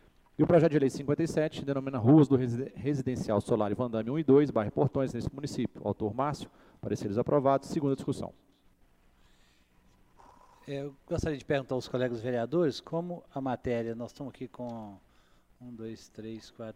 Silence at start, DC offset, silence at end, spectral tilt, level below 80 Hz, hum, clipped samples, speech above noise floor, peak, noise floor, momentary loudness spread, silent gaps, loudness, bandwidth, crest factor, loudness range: 0.4 s; under 0.1%; 0.05 s; -7.5 dB/octave; -58 dBFS; none; under 0.1%; 34 dB; -10 dBFS; -64 dBFS; 19 LU; none; -30 LUFS; 12.5 kHz; 20 dB; 12 LU